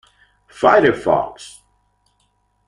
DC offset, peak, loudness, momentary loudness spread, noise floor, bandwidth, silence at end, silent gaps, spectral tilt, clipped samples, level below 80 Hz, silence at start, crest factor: under 0.1%; -2 dBFS; -16 LUFS; 24 LU; -64 dBFS; 11.5 kHz; 1.2 s; none; -5.5 dB/octave; under 0.1%; -52 dBFS; 0.6 s; 18 dB